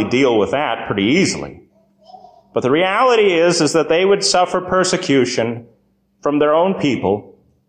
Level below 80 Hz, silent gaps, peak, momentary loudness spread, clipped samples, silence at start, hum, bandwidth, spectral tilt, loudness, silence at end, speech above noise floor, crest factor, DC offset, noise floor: -52 dBFS; none; -2 dBFS; 10 LU; under 0.1%; 0 s; none; 10 kHz; -4 dB/octave; -16 LUFS; 0.4 s; 44 dB; 14 dB; under 0.1%; -59 dBFS